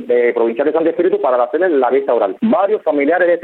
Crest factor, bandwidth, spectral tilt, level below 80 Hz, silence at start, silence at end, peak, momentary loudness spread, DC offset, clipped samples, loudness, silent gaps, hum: 12 dB; 4.2 kHz; -9 dB/octave; -68 dBFS; 0 s; 0 s; -2 dBFS; 2 LU; under 0.1%; under 0.1%; -15 LUFS; none; none